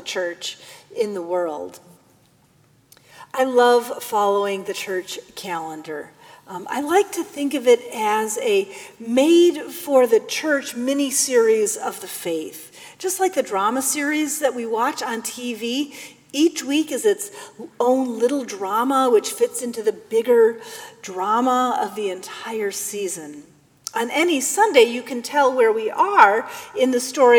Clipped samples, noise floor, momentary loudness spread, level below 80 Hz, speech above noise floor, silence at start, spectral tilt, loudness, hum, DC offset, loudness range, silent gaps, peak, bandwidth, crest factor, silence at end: under 0.1%; -57 dBFS; 16 LU; -74 dBFS; 37 dB; 0 s; -2.5 dB/octave; -20 LUFS; none; under 0.1%; 6 LU; none; 0 dBFS; 20 kHz; 20 dB; 0 s